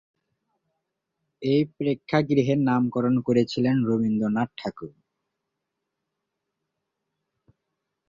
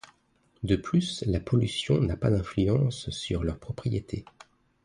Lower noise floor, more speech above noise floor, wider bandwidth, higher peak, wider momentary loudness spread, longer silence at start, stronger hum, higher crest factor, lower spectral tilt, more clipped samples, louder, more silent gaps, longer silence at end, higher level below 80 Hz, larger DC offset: first, -82 dBFS vs -67 dBFS; first, 59 dB vs 40 dB; second, 7.4 kHz vs 10.5 kHz; first, -6 dBFS vs -10 dBFS; about the same, 11 LU vs 9 LU; first, 1.4 s vs 0.6 s; neither; about the same, 20 dB vs 18 dB; first, -8 dB/octave vs -6.5 dB/octave; neither; first, -24 LUFS vs -28 LUFS; neither; first, 3.2 s vs 0.6 s; second, -62 dBFS vs -42 dBFS; neither